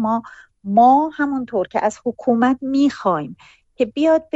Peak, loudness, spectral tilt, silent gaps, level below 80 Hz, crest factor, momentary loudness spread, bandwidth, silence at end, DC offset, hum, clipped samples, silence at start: -4 dBFS; -18 LUFS; -6.5 dB/octave; none; -56 dBFS; 16 dB; 11 LU; 8 kHz; 0.1 s; under 0.1%; none; under 0.1%; 0 s